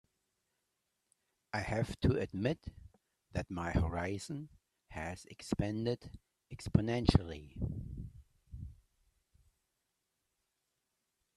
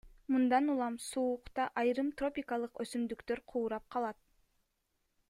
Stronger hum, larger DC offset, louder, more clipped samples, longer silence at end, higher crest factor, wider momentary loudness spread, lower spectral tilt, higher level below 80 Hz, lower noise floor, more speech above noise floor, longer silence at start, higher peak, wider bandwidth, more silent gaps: neither; neither; about the same, -37 LUFS vs -35 LUFS; neither; first, 2.65 s vs 1.15 s; first, 30 dB vs 18 dB; first, 19 LU vs 9 LU; first, -7 dB/octave vs -4.5 dB/octave; first, -50 dBFS vs -66 dBFS; first, -85 dBFS vs -81 dBFS; first, 50 dB vs 46 dB; first, 1.55 s vs 0.05 s; first, -8 dBFS vs -18 dBFS; about the same, 12.5 kHz vs 13.5 kHz; neither